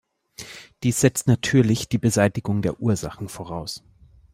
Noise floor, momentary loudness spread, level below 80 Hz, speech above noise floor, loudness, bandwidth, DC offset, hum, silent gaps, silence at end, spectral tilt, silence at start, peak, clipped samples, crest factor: -43 dBFS; 19 LU; -50 dBFS; 22 dB; -22 LUFS; 16 kHz; under 0.1%; none; none; 0.55 s; -5.5 dB/octave; 0.4 s; -4 dBFS; under 0.1%; 20 dB